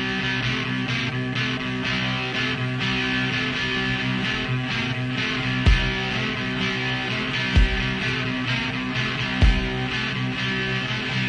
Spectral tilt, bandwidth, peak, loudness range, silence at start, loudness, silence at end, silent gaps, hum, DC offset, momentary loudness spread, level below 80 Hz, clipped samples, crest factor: -5 dB/octave; 10 kHz; -6 dBFS; 1 LU; 0 s; -23 LUFS; 0 s; none; none; under 0.1%; 4 LU; -30 dBFS; under 0.1%; 18 dB